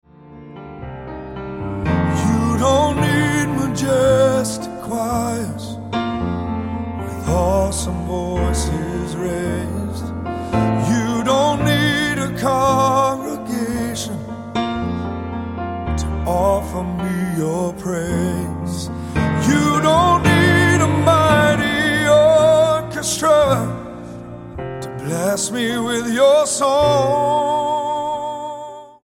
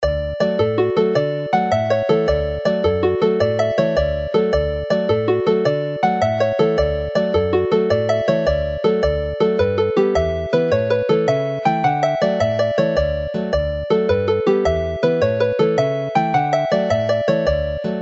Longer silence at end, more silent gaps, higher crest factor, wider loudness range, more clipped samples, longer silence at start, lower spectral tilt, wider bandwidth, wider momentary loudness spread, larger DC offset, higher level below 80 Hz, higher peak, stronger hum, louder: first, 0.15 s vs 0 s; neither; about the same, 16 dB vs 14 dB; first, 8 LU vs 1 LU; neither; first, 0.2 s vs 0 s; second, -5 dB/octave vs -7 dB/octave; first, 17 kHz vs 7.8 kHz; first, 14 LU vs 3 LU; neither; about the same, -34 dBFS vs -34 dBFS; about the same, -2 dBFS vs -2 dBFS; neither; about the same, -18 LUFS vs -18 LUFS